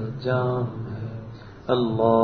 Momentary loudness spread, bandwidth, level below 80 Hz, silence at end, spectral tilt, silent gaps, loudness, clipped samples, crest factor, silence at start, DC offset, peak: 17 LU; 6.2 kHz; -52 dBFS; 0 s; -9.5 dB/octave; none; -25 LUFS; under 0.1%; 18 dB; 0 s; under 0.1%; -6 dBFS